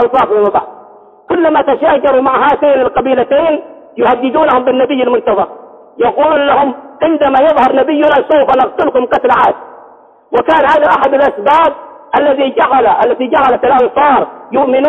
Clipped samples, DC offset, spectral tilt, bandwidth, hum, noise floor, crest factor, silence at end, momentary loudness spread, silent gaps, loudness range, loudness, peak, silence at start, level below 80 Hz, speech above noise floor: under 0.1%; under 0.1%; -6.5 dB/octave; 6.2 kHz; none; -40 dBFS; 10 dB; 0 s; 6 LU; none; 2 LU; -10 LUFS; 0 dBFS; 0 s; -46 dBFS; 31 dB